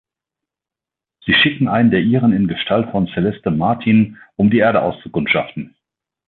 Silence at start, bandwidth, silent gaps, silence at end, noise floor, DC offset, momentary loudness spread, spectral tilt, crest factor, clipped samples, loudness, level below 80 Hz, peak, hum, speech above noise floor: 1.25 s; 4.3 kHz; none; 0.65 s; -87 dBFS; under 0.1%; 9 LU; -10 dB/octave; 14 dB; under 0.1%; -16 LUFS; -48 dBFS; -2 dBFS; none; 72 dB